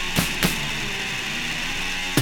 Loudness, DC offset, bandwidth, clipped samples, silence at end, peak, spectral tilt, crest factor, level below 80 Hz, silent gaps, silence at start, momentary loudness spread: -24 LUFS; under 0.1%; 20 kHz; under 0.1%; 0 s; -4 dBFS; -3 dB/octave; 22 dB; -36 dBFS; none; 0 s; 4 LU